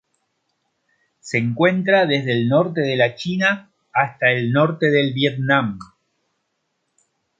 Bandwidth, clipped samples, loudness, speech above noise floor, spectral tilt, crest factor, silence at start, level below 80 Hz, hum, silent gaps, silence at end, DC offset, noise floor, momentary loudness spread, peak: 7.8 kHz; under 0.1%; -18 LUFS; 54 dB; -6.5 dB/octave; 18 dB; 1.25 s; -62 dBFS; none; none; 1.55 s; under 0.1%; -73 dBFS; 6 LU; -2 dBFS